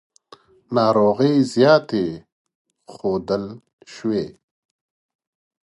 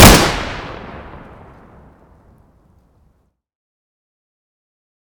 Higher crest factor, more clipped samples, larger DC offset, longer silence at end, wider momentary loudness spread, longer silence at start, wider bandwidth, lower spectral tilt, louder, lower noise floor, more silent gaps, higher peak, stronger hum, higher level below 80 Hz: about the same, 20 dB vs 18 dB; second, under 0.1% vs 1%; neither; second, 1.35 s vs 4.25 s; second, 14 LU vs 28 LU; first, 0.7 s vs 0 s; second, 11.5 kHz vs 19.5 kHz; first, -6.5 dB/octave vs -3.5 dB/octave; second, -19 LUFS vs -13 LUFS; second, -50 dBFS vs -60 dBFS; first, 2.32-2.45 s, 2.55-2.65 s, 3.73-3.78 s vs none; about the same, -2 dBFS vs 0 dBFS; neither; second, -58 dBFS vs -26 dBFS